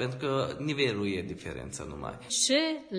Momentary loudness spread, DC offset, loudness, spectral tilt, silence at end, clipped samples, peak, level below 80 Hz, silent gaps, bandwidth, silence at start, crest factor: 14 LU; under 0.1%; -30 LUFS; -3.5 dB/octave; 0 s; under 0.1%; -14 dBFS; -56 dBFS; none; 10.5 kHz; 0 s; 16 dB